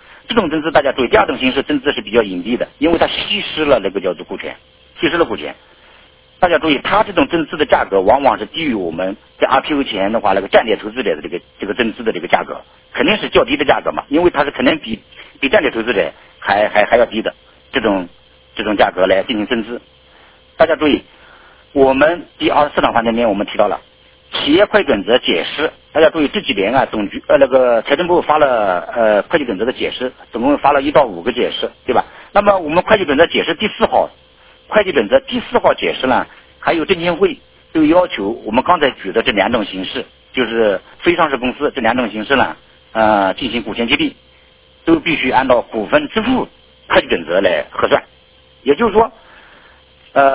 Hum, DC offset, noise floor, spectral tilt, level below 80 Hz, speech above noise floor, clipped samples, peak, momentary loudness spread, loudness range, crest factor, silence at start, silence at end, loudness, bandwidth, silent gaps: none; under 0.1%; -48 dBFS; -8.5 dB/octave; -42 dBFS; 33 dB; under 0.1%; 0 dBFS; 9 LU; 3 LU; 16 dB; 0.3 s; 0 s; -15 LUFS; 4 kHz; none